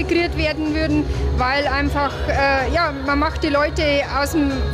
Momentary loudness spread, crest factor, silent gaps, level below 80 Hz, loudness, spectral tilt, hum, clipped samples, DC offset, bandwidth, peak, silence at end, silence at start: 3 LU; 12 dB; none; -26 dBFS; -19 LUFS; -5.5 dB/octave; none; under 0.1%; under 0.1%; 15 kHz; -6 dBFS; 0 s; 0 s